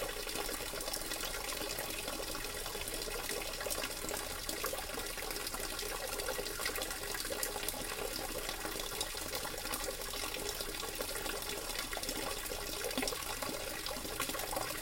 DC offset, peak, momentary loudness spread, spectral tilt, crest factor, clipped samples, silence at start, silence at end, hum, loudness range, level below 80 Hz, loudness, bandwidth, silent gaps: under 0.1%; -14 dBFS; 2 LU; -1.5 dB/octave; 26 dB; under 0.1%; 0 s; 0 s; none; 1 LU; -50 dBFS; -38 LUFS; 17 kHz; none